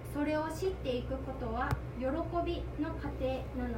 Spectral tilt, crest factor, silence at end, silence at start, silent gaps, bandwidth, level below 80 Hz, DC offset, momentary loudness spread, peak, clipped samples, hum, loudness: -7 dB/octave; 16 dB; 0 s; 0 s; none; 16 kHz; -44 dBFS; under 0.1%; 4 LU; -18 dBFS; under 0.1%; none; -36 LUFS